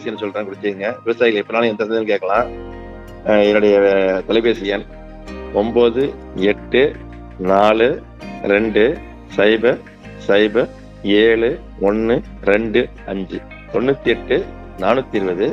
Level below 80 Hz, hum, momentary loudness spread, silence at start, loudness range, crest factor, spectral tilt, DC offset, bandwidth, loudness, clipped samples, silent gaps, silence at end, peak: -40 dBFS; none; 15 LU; 0 s; 3 LU; 16 dB; -6.5 dB/octave; under 0.1%; 7.4 kHz; -17 LUFS; under 0.1%; none; 0 s; 0 dBFS